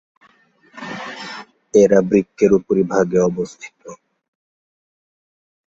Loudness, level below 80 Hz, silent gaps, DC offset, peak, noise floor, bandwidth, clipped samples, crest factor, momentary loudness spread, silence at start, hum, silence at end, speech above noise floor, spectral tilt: -16 LUFS; -54 dBFS; none; under 0.1%; 0 dBFS; -55 dBFS; 7.8 kHz; under 0.1%; 20 dB; 22 LU; 0.75 s; none; 1.7 s; 39 dB; -6.5 dB/octave